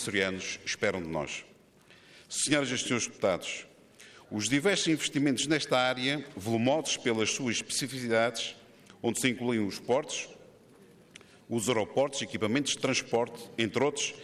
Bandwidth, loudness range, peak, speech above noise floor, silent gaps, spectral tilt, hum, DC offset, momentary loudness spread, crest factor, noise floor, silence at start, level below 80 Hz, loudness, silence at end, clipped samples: 15 kHz; 4 LU; -12 dBFS; 29 dB; none; -3.5 dB/octave; none; under 0.1%; 9 LU; 18 dB; -59 dBFS; 0 s; -68 dBFS; -30 LUFS; 0 s; under 0.1%